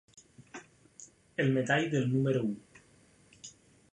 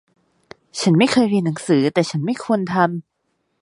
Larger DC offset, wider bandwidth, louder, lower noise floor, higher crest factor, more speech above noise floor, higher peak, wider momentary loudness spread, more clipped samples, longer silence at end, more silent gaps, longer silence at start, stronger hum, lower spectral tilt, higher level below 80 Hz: neither; about the same, 10.5 kHz vs 11.5 kHz; second, -30 LUFS vs -18 LUFS; second, -63 dBFS vs -70 dBFS; about the same, 20 dB vs 18 dB; second, 34 dB vs 53 dB; second, -14 dBFS vs -2 dBFS; first, 23 LU vs 8 LU; neither; second, 0.4 s vs 0.6 s; neither; second, 0.4 s vs 0.75 s; neither; about the same, -6 dB/octave vs -6 dB/octave; second, -70 dBFS vs -62 dBFS